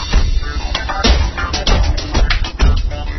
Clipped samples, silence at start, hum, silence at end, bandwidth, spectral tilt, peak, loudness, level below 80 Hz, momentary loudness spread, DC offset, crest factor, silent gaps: under 0.1%; 0 s; none; 0 s; 6.2 kHz; -4.5 dB/octave; 0 dBFS; -17 LUFS; -16 dBFS; 6 LU; under 0.1%; 14 dB; none